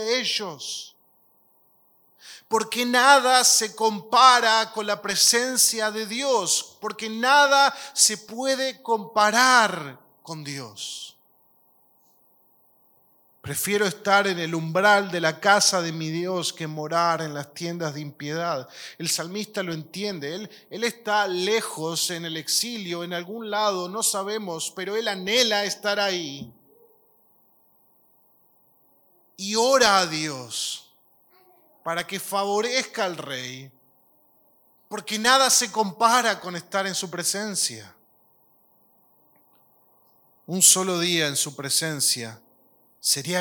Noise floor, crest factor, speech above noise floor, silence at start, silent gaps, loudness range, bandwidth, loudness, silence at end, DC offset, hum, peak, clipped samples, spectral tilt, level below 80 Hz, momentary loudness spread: -61 dBFS; 24 dB; 38 dB; 0 s; none; 10 LU; 19 kHz; -22 LUFS; 0 s; under 0.1%; none; 0 dBFS; under 0.1%; -1.5 dB/octave; -72 dBFS; 16 LU